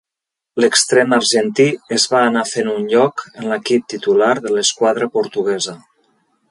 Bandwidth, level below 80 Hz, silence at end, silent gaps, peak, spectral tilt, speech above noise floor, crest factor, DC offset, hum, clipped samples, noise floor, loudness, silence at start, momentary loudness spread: 11.5 kHz; -66 dBFS; 0.75 s; none; 0 dBFS; -3 dB/octave; 69 dB; 16 dB; under 0.1%; none; under 0.1%; -84 dBFS; -16 LUFS; 0.55 s; 8 LU